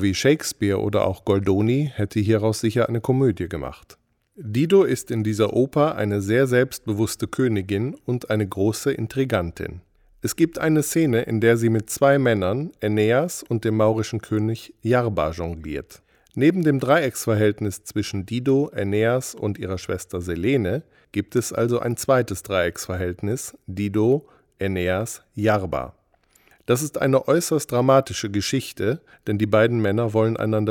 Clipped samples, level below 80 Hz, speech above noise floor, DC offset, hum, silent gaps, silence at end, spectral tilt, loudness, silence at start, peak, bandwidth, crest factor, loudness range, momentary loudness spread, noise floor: under 0.1%; -52 dBFS; 39 dB; under 0.1%; none; none; 0 s; -6 dB/octave; -22 LUFS; 0 s; -4 dBFS; 18.5 kHz; 18 dB; 4 LU; 10 LU; -60 dBFS